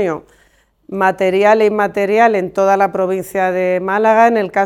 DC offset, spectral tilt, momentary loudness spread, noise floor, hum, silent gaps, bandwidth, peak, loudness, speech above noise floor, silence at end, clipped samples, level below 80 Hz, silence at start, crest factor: under 0.1%; -6 dB/octave; 7 LU; -55 dBFS; none; none; 17 kHz; 0 dBFS; -14 LUFS; 41 dB; 0 s; under 0.1%; -56 dBFS; 0 s; 14 dB